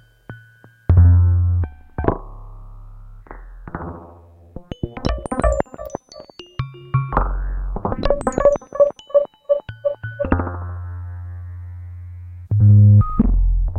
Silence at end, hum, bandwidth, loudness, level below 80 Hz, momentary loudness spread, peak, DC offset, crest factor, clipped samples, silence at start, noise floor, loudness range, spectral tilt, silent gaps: 0 s; none; 9.6 kHz; -19 LUFS; -28 dBFS; 22 LU; -2 dBFS; under 0.1%; 18 dB; under 0.1%; 0.3 s; -49 dBFS; 10 LU; -8.5 dB/octave; none